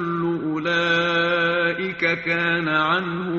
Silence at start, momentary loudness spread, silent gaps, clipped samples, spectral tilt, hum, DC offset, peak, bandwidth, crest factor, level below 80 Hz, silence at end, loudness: 0 s; 5 LU; none; under 0.1%; -2.5 dB/octave; none; under 0.1%; -8 dBFS; 7.6 kHz; 14 dB; -58 dBFS; 0 s; -21 LUFS